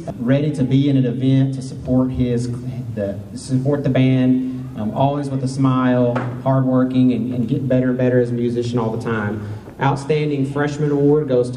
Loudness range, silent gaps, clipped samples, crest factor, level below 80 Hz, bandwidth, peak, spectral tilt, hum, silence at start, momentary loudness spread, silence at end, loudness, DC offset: 2 LU; none; under 0.1%; 14 dB; -46 dBFS; 10.5 kHz; -4 dBFS; -8 dB/octave; none; 0 s; 9 LU; 0 s; -19 LUFS; under 0.1%